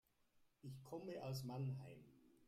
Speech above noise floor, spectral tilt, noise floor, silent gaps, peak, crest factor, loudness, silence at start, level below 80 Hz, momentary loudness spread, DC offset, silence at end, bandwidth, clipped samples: 28 dB; -6.5 dB/octave; -78 dBFS; none; -38 dBFS; 14 dB; -51 LUFS; 0.35 s; -82 dBFS; 15 LU; under 0.1%; 0 s; 15.5 kHz; under 0.1%